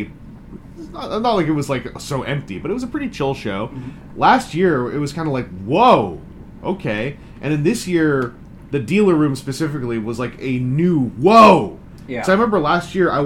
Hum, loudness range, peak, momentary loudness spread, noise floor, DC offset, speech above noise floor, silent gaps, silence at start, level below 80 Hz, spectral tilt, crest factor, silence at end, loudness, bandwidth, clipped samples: none; 7 LU; 0 dBFS; 16 LU; -37 dBFS; under 0.1%; 20 dB; none; 0 s; -44 dBFS; -6.5 dB/octave; 18 dB; 0 s; -18 LUFS; 16.5 kHz; under 0.1%